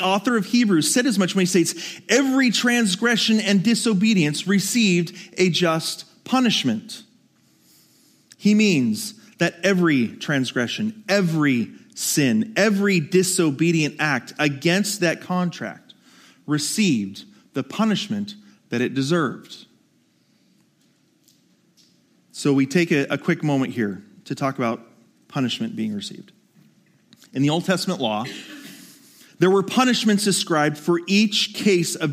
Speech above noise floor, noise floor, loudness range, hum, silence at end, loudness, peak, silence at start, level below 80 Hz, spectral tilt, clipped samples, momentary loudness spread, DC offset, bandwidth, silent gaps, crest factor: 41 dB; -62 dBFS; 8 LU; none; 0 s; -21 LUFS; -2 dBFS; 0 s; -72 dBFS; -4.5 dB/octave; under 0.1%; 14 LU; under 0.1%; 15.5 kHz; none; 20 dB